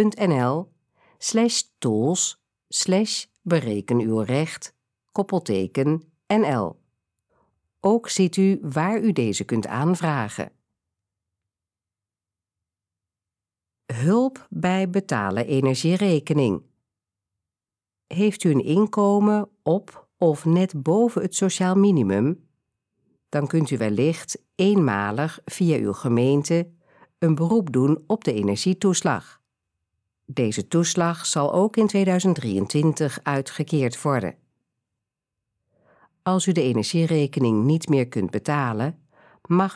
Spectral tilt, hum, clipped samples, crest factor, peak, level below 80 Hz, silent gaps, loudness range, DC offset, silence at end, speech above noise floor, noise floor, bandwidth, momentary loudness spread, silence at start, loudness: -5.5 dB/octave; none; under 0.1%; 16 dB; -6 dBFS; -68 dBFS; none; 5 LU; under 0.1%; 0 s; over 69 dB; under -90 dBFS; 11 kHz; 8 LU; 0 s; -22 LUFS